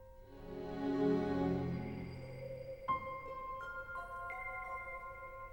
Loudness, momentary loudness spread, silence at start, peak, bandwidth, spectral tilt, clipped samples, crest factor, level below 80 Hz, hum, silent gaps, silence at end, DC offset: -41 LUFS; 13 LU; 0 s; -24 dBFS; 17 kHz; -8 dB/octave; under 0.1%; 18 dB; -58 dBFS; none; none; 0 s; under 0.1%